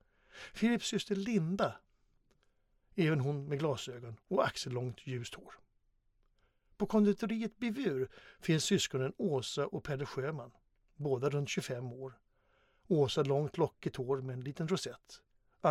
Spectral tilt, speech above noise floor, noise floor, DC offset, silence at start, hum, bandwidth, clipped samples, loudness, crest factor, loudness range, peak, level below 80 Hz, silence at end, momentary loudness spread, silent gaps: -5.5 dB/octave; 39 dB; -74 dBFS; under 0.1%; 0.35 s; none; 15 kHz; under 0.1%; -35 LUFS; 20 dB; 4 LU; -16 dBFS; -68 dBFS; 0 s; 14 LU; none